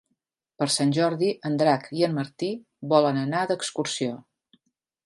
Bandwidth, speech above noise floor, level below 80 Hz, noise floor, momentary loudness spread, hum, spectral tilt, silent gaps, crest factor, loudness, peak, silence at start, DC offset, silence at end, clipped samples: 11.5 kHz; 54 dB; -74 dBFS; -78 dBFS; 10 LU; none; -5 dB/octave; none; 20 dB; -25 LUFS; -6 dBFS; 0.6 s; under 0.1%; 0.9 s; under 0.1%